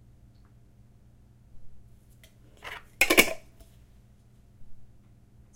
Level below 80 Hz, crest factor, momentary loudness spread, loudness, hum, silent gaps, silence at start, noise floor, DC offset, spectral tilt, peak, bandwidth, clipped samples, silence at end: -52 dBFS; 30 dB; 23 LU; -22 LUFS; none; none; 1.55 s; -56 dBFS; under 0.1%; -1.5 dB/octave; -2 dBFS; 16 kHz; under 0.1%; 0.7 s